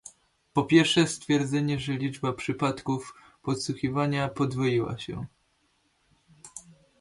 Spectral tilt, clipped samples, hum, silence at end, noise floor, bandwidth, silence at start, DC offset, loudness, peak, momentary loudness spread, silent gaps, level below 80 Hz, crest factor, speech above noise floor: -5.5 dB/octave; under 0.1%; none; 0.4 s; -70 dBFS; 11.5 kHz; 0.05 s; under 0.1%; -27 LUFS; -8 dBFS; 20 LU; none; -58 dBFS; 20 dB; 43 dB